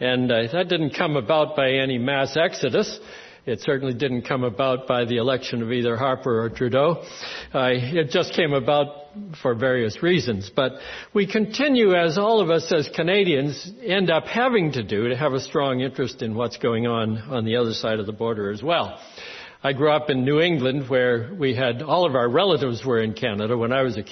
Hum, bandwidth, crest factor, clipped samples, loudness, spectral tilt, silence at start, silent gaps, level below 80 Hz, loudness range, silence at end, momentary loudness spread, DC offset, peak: none; 6.4 kHz; 16 dB; under 0.1%; -22 LUFS; -6 dB/octave; 0 s; none; -58 dBFS; 4 LU; 0 s; 7 LU; under 0.1%; -6 dBFS